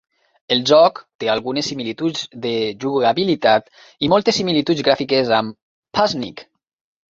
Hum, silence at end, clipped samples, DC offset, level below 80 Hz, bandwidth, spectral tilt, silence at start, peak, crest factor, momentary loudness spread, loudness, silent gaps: none; 0.7 s; under 0.1%; under 0.1%; -58 dBFS; 7.8 kHz; -4.5 dB/octave; 0.5 s; 0 dBFS; 18 dB; 10 LU; -18 LUFS; 1.15-1.19 s, 5.62-5.82 s